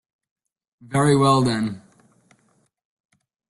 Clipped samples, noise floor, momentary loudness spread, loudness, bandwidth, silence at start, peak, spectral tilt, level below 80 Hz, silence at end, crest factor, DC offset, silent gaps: under 0.1%; -65 dBFS; 12 LU; -19 LUFS; 12 kHz; 0.9 s; -4 dBFS; -6 dB/octave; -56 dBFS; 1.7 s; 20 dB; under 0.1%; none